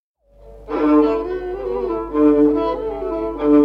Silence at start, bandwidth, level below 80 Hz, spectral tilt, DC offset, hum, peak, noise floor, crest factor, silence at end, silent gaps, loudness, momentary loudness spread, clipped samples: 0.45 s; 5.2 kHz; -40 dBFS; -8.5 dB/octave; under 0.1%; none; -4 dBFS; -43 dBFS; 14 dB; 0 s; none; -18 LUFS; 10 LU; under 0.1%